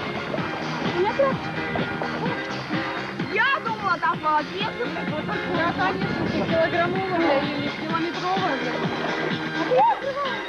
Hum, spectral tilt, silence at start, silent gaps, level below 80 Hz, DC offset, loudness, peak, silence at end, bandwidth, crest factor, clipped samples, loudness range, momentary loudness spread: none; -6 dB/octave; 0 s; none; -56 dBFS; under 0.1%; -24 LUFS; -10 dBFS; 0 s; 12.5 kHz; 14 dB; under 0.1%; 1 LU; 6 LU